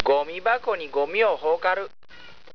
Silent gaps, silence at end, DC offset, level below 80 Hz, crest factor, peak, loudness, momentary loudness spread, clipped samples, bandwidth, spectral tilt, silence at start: none; 0.25 s; 0.8%; -62 dBFS; 24 dB; 0 dBFS; -24 LUFS; 5 LU; under 0.1%; 5.4 kHz; -4.5 dB/octave; 0 s